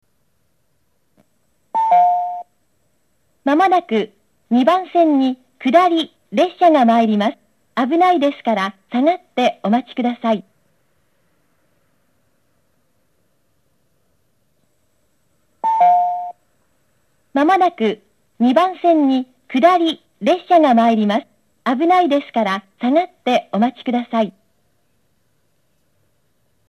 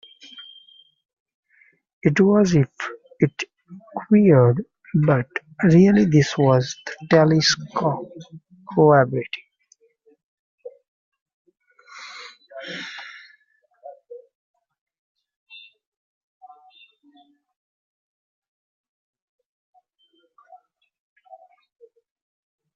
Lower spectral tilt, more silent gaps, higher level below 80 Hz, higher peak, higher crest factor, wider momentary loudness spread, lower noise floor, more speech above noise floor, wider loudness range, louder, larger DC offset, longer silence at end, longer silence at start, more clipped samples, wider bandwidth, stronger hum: about the same, -6 dB/octave vs -6 dB/octave; second, none vs 1.13-1.26 s, 1.34-1.43 s, 1.93-2.01 s, 10.23-10.58 s, 10.88-11.12 s, 11.21-11.26 s, 11.33-11.45 s; second, -72 dBFS vs -60 dBFS; about the same, 0 dBFS vs -2 dBFS; about the same, 18 dB vs 20 dB; second, 9 LU vs 25 LU; about the same, -67 dBFS vs -65 dBFS; first, 52 dB vs 47 dB; second, 7 LU vs 21 LU; about the same, -17 LUFS vs -19 LUFS; neither; second, 2.4 s vs 8.6 s; first, 1.75 s vs 0.35 s; neither; first, 12 kHz vs 7.4 kHz; neither